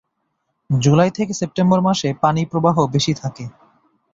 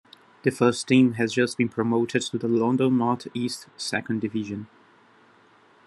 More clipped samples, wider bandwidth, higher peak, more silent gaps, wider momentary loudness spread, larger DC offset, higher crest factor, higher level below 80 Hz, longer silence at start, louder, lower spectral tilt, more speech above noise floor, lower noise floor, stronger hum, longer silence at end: neither; second, 7.8 kHz vs 12 kHz; first, -2 dBFS vs -6 dBFS; neither; about the same, 10 LU vs 11 LU; neither; about the same, 16 dB vs 20 dB; first, -52 dBFS vs -68 dBFS; first, 0.7 s vs 0.45 s; first, -18 LUFS vs -24 LUFS; about the same, -6 dB/octave vs -5.5 dB/octave; first, 55 dB vs 33 dB; first, -72 dBFS vs -57 dBFS; neither; second, 0.65 s vs 1.2 s